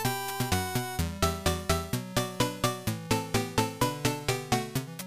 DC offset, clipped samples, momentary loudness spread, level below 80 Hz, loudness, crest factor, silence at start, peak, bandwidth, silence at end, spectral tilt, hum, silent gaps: 0.2%; under 0.1%; 3 LU; -44 dBFS; -30 LUFS; 20 dB; 0 s; -10 dBFS; 15.5 kHz; 0 s; -4 dB/octave; none; none